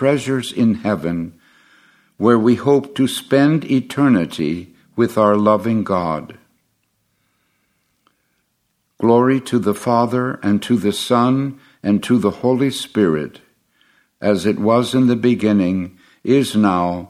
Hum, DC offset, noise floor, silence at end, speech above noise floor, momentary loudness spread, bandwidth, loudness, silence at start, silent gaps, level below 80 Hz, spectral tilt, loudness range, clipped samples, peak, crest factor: none; under 0.1%; -68 dBFS; 0.05 s; 52 dB; 9 LU; 15 kHz; -17 LUFS; 0 s; none; -60 dBFS; -6.5 dB/octave; 5 LU; under 0.1%; 0 dBFS; 18 dB